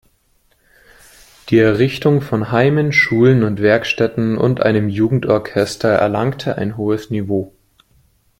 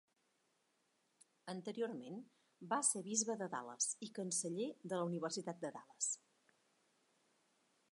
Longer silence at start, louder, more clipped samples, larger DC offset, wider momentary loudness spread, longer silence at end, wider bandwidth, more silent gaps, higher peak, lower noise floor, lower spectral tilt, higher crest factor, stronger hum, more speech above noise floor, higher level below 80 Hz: about the same, 1.45 s vs 1.45 s; first, -16 LUFS vs -41 LUFS; neither; neither; second, 8 LU vs 14 LU; second, 0.9 s vs 1.75 s; first, 16 kHz vs 11.5 kHz; neither; first, -2 dBFS vs -22 dBFS; second, -59 dBFS vs -81 dBFS; first, -7 dB/octave vs -3 dB/octave; second, 14 dB vs 24 dB; neither; first, 44 dB vs 39 dB; first, -50 dBFS vs under -90 dBFS